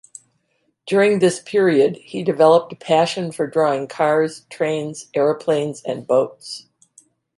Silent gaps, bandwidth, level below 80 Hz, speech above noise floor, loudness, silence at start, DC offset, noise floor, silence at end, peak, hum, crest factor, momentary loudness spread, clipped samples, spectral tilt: none; 11.5 kHz; -70 dBFS; 50 dB; -19 LUFS; 0.85 s; under 0.1%; -68 dBFS; 0.75 s; -2 dBFS; none; 18 dB; 11 LU; under 0.1%; -5.5 dB/octave